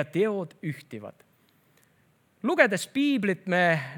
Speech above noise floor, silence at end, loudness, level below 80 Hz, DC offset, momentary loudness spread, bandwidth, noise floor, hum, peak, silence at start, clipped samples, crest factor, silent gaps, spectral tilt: 39 dB; 0 s; -26 LUFS; -82 dBFS; under 0.1%; 18 LU; 19 kHz; -65 dBFS; none; -4 dBFS; 0 s; under 0.1%; 24 dB; none; -5.5 dB/octave